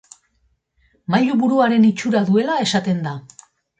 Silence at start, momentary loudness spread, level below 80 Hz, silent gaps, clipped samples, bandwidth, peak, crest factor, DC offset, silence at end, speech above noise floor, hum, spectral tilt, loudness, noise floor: 1.1 s; 12 LU; -62 dBFS; none; under 0.1%; 9 kHz; -4 dBFS; 16 dB; under 0.1%; 0.6 s; 48 dB; none; -6 dB/octave; -18 LUFS; -65 dBFS